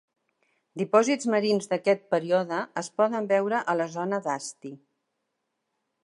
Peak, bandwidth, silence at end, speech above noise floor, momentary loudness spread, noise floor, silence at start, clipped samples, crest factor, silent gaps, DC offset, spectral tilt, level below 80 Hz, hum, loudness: -6 dBFS; 11.5 kHz; 1.25 s; 54 dB; 11 LU; -80 dBFS; 0.75 s; under 0.1%; 20 dB; none; under 0.1%; -4.5 dB/octave; -82 dBFS; none; -26 LUFS